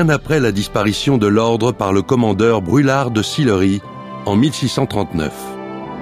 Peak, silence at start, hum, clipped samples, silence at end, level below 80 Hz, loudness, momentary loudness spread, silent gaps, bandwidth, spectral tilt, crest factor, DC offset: -2 dBFS; 0 s; none; under 0.1%; 0 s; -42 dBFS; -16 LUFS; 11 LU; none; 15.5 kHz; -6 dB/octave; 14 dB; under 0.1%